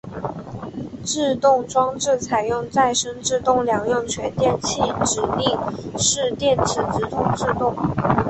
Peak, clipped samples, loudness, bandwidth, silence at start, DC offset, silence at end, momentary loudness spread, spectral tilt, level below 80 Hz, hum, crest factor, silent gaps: -4 dBFS; under 0.1%; -21 LUFS; 8.6 kHz; 0.05 s; under 0.1%; 0 s; 10 LU; -4 dB/octave; -44 dBFS; none; 18 dB; none